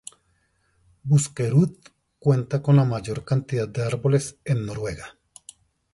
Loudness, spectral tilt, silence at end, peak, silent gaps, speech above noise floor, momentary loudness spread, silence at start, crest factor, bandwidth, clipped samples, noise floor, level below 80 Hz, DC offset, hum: -23 LUFS; -7 dB/octave; 0.85 s; -6 dBFS; none; 45 dB; 13 LU; 1.05 s; 18 dB; 11.5 kHz; under 0.1%; -67 dBFS; -54 dBFS; under 0.1%; none